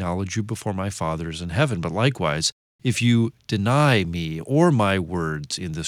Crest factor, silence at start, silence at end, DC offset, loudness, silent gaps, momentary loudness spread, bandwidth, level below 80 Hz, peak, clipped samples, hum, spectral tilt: 18 dB; 0 s; 0 s; under 0.1%; -23 LUFS; 2.52-2.79 s; 10 LU; 15 kHz; -46 dBFS; -4 dBFS; under 0.1%; none; -5.5 dB/octave